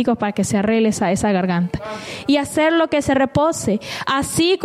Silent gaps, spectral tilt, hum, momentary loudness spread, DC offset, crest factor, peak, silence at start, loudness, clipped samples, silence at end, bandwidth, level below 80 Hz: none; -5 dB/octave; none; 6 LU; under 0.1%; 12 dB; -6 dBFS; 0 s; -18 LUFS; under 0.1%; 0 s; 15 kHz; -46 dBFS